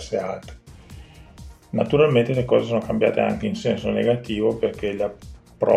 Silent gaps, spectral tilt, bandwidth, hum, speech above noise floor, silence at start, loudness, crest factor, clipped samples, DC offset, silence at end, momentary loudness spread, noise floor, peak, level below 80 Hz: none; -7 dB/octave; 11.5 kHz; none; 22 dB; 0 s; -22 LUFS; 18 dB; under 0.1%; under 0.1%; 0 s; 11 LU; -43 dBFS; -4 dBFS; -46 dBFS